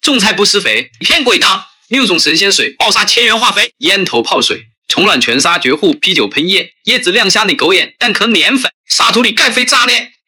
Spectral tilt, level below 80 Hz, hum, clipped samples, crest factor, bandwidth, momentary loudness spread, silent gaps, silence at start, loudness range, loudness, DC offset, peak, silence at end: -1.5 dB/octave; -52 dBFS; none; under 0.1%; 12 dB; over 20 kHz; 5 LU; 4.78-4.82 s, 8.74-8.84 s; 0.05 s; 1 LU; -9 LUFS; under 0.1%; 0 dBFS; 0.2 s